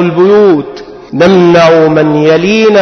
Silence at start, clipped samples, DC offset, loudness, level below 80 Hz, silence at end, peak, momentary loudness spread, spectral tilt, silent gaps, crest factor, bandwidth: 0 s; 0.3%; under 0.1%; -6 LUFS; -42 dBFS; 0 s; 0 dBFS; 13 LU; -6.5 dB/octave; none; 6 dB; 6.6 kHz